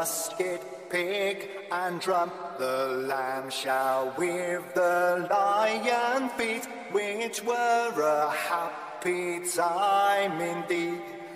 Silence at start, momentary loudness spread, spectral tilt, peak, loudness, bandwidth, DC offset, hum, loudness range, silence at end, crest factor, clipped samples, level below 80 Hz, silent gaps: 0 s; 8 LU; -3 dB/octave; -14 dBFS; -28 LUFS; 16 kHz; under 0.1%; none; 3 LU; 0 s; 14 dB; under 0.1%; -78 dBFS; none